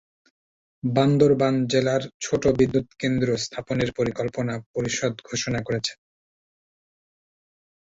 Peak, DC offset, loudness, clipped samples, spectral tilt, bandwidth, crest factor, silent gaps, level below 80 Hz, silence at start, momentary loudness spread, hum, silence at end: -6 dBFS; under 0.1%; -24 LUFS; under 0.1%; -5.5 dB/octave; 8 kHz; 20 dB; 2.14-2.20 s, 4.66-4.74 s; -52 dBFS; 0.85 s; 10 LU; none; 1.9 s